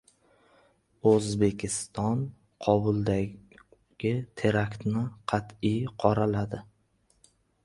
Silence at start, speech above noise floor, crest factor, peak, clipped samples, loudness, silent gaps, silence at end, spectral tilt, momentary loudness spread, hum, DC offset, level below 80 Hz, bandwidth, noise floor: 1.05 s; 42 dB; 22 dB; -6 dBFS; under 0.1%; -28 LUFS; none; 1.05 s; -6.5 dB/octave; 8 LU; none; under 0.1%; -54 dBFS; 11.5 kHz; -69 dBFS